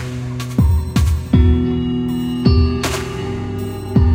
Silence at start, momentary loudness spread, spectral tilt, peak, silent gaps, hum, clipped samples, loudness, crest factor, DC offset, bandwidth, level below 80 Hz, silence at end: 0 s; 10 LU; -7 dB/octave; 0 dBFS; none; none; under 0.1%; -18 LUFS; 14 dB; under 0.1%; 16 kHz; -22 dBFS; 0 s